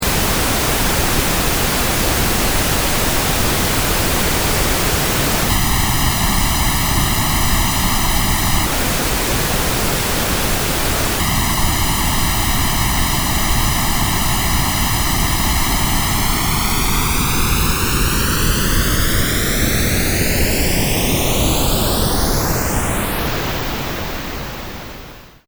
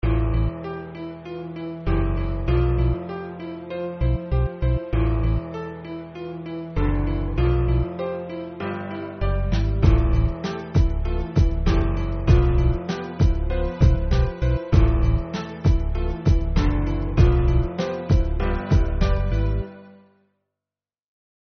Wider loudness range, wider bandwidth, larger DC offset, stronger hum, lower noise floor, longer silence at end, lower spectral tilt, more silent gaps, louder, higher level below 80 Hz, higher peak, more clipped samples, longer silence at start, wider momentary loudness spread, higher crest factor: second, 1 LU vs 4 LU; first, over 20 kHz vs 6.4 kHz; neither; neither; second, -37 dBFS vs under -90 dBFS; second, 0.2 s vs 1.55 s; second, -3 dB/octave vs -8 dB/octave; neither; first, -16 LUFS vs -23 LUFS; about the same, -22 dBFS vs -24 dBFS; about the same, -2 dBFS vs -4 dBFS; neither; about the same, 0 s vs 0.05 s; second, 2 LU vs 13 LU; about the same, 14 dB vs 18 dB